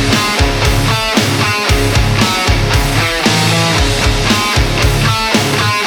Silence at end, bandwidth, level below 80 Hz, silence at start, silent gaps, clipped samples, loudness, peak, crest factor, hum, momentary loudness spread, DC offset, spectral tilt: 0 s; over 20 kHz; -20 dBFS; 0 s; none; under 0.1%; -12 LUFS; -2 dBFS; 10 dB; none; 1 LU; under 0.1%; -4 dB/octave